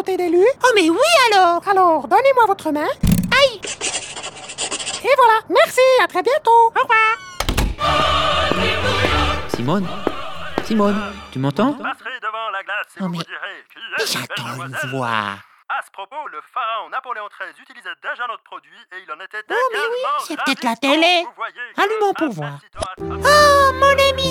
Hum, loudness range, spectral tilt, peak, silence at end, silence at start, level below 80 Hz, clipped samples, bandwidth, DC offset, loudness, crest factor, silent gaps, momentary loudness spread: none; 11 LU; -4 dB/octave; 0 dBFS; 0 s; 0 s; -36 dBFS; under 0.1%; 18 kHz; under 0.1%; -17 LUFS; 18 dB; none; 16 LU